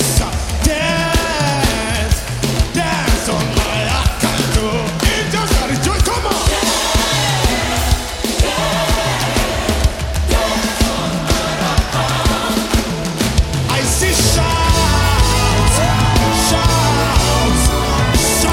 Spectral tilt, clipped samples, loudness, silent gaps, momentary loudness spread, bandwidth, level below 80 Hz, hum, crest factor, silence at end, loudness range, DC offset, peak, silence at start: -4 dB/octave; under 0.1%; -15 LUFS; none; 4 LU; 16.5 kHz; -20 dBFS; none; 14 dB; 0 s; 3 LU; under 0.1%; 0 dBFS; 0 s